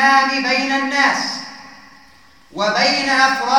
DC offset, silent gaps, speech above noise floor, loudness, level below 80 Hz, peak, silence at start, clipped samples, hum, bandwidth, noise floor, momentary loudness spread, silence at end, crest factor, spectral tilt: 0.3%; none; 33 dB; -16 LUFS; -60 dBFS; 0 dBFS; 0 s; under 0.1%; none; 18 kHz; -49 dBFS; 12 LU; 0 s; 16 dB; -2 dB/octave